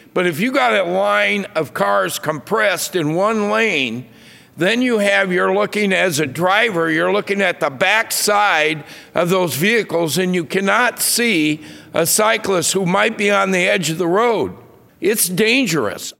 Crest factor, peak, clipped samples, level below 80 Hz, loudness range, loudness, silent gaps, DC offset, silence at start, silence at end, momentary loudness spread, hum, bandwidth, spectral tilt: 16 dB; 0 dBFS; under 0.1%; -64 dBFS; 2 LU; -16 LUFS; none; under 0.1%; 0.15 s; 0.1 s; 6 LU; none; 16.5 kHz; -3.5 dB/octave